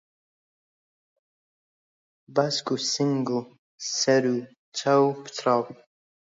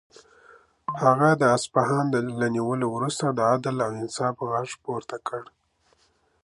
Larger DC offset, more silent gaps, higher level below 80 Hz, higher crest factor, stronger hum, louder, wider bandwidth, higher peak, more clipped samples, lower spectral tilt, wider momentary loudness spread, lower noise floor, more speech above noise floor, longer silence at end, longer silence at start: neither; first, 3.59-3.78 s, 4.58-4.72 s vs none; second, -78 dBFS vs -66 dBFS; about the same, 20 dB vs 22 dB; neither; about the same, -25 LUFS vs -24 LUFS; second, 7.8 kHz vs 11.5 kHz; second, -8 dBFS vs -4 dBFS; neither; second, -4 dB/octave vs -5.5 dB/octave; second, 10 LU vs 14 LU; first, under -90 dBFS vs -66 dBFS; first, over 66 dB vs 42 dB; second, 0.55 s vs 1 s; first, 2.3 s vs 0.9 s